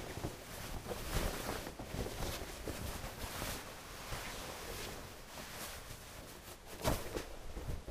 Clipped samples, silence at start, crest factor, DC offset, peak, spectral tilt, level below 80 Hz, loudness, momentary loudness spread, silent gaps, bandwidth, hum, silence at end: under 0.1%; 0 s; 22 dB; under 0.1%; -20 dBFS; -4 dB/octave; -48 dBFS; -44 LUFS; 10 LU; none; 15.5 kHz; none; 0 s